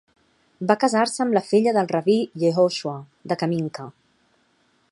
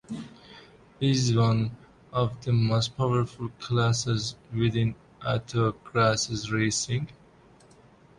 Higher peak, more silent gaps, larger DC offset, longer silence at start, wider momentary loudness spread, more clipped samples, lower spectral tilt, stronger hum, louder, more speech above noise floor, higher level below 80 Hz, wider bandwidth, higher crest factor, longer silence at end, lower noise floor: first, -2 dBFS vs -8 dBFS; neither; neither; first, 0.6 s vs 0.1 s; first, 13 LU vs 10 LU; neither; about the same, -5.5 dB/octave vs -5 dB/octave; neither; first, -22 LUFS vs -27 LUFS; first, 43 dB vs 30 dB; second, -70 dBFS vs -54 dBFS; about the same, 11.5 kHz vs 11 kHz; about the same, 20 dB vs 18 dB; about the same, 1 s vs 1.05 s; first, -64 dBFS vs -55 dBFS